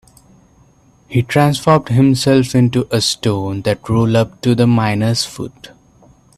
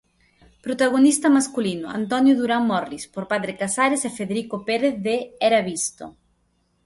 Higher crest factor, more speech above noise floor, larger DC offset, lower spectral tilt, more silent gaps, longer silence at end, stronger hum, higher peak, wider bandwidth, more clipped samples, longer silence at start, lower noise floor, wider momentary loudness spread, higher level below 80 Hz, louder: about the same, 16 dB vs 16 dB; second, 36 dB vs 46 dB; neither; first, -6 dB/octave vs -4 dB/octave; neither; about the same, 0.7 s vs 0.75 s; neither; first, 0 dBFS vs -6 dBFS; first, 14 kHz vs 11.5 kHz; neither; first, 1.1 s vs 0.65 s; second, -50 dBFS vs -67 dBFS; second, 7 LU vs 12 LU; first, -46 dBFS vs -62 dBFS; first, -15 LUFS vs -21 LUFS